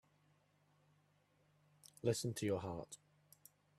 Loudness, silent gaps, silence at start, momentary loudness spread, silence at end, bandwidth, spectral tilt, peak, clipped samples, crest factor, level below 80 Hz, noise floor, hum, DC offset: -42 LUFS; none; 2.05 s; 18 LU; 0.8 s; 15 kHz; -5 dB/octave; -24 dBFS; under 0.1%; 22 dB; -76 dBFS; -76 dBFS; 50 Hz at -65 dBFS; under 0.1%